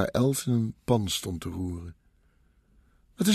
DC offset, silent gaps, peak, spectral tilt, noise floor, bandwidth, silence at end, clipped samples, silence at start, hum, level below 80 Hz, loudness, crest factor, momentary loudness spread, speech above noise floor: under 0.1%; none; -10 dBFS; -5.5 dB/octave; -64 dBFS; 14 kHz; 0 s; under 0.1%; 0 s; none; -52 dBFS; -29 LUFS; 20 dB; 11 LU; 36 dB